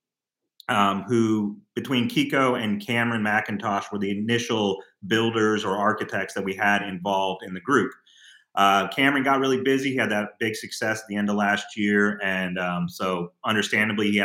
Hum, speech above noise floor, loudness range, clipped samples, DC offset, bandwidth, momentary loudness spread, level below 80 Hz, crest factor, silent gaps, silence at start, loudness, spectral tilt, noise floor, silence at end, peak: none; 62 dB; 2 LU; under 0.1%; under 0.1%; 16.5 kHz; 7 LU; -72 dBFS; 20 dB; none; 0.7 s; -24 LUFS; -5 dB/octave; -85 dBFS; 0 s; -4 dBFS